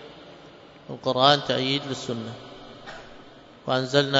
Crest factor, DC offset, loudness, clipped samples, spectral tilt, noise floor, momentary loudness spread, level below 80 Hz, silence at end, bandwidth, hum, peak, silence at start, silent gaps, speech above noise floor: 24 dB; under 0.1%; -24 LUFS; under 0.1%; -4.5 dB/octave; -48 dBFS; 26 LU; -62 dBFS; 0 s; 8 kHz; none; -2 dBFS; 0 s; none; 24 dB